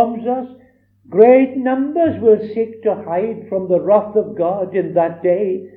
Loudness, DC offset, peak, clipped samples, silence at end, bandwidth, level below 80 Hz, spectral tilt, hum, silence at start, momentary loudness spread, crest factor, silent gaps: -16 LUFS; under 0.1%; 0 dBFS; under 0.1%; 0.1 s; 4.2 kHz; -62 dBFS; -11 dB/octave; none; 0 s; 11 LU; 16 dB; none